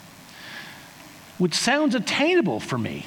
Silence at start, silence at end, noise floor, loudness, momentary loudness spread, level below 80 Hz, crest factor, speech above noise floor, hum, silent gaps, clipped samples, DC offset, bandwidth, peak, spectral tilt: 0 s; 0 s; -45 dBFS; -22 LUFS; 23 LU; -64 dBFS; 18 dB; 23 dB; none; none; under 0.1%; under 0.1%; 19.5 kHz; -8 dBFS; -4 dB/octave